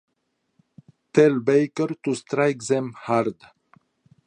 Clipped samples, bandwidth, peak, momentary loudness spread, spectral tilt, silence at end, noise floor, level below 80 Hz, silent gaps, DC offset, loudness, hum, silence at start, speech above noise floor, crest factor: under 0.1%; 9.8 kHz; -2 dBFS; 8 LU; -6 dB/octave; 0.95 s; -74 dBFS; -72 dBFS; none; under 0.1%; -22 LUFS; none; 1.15 s; 53 dB; 22 dB